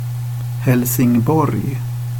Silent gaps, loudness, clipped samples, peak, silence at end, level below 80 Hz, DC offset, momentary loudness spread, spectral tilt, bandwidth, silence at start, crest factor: none; -17 LUFS; under 0.1%; -4 dBFS; 0 s; -44 dBFS; under 0.1%; 9 LU; -7 dB/octave; 17.5 kHz; 0 s; 14 dB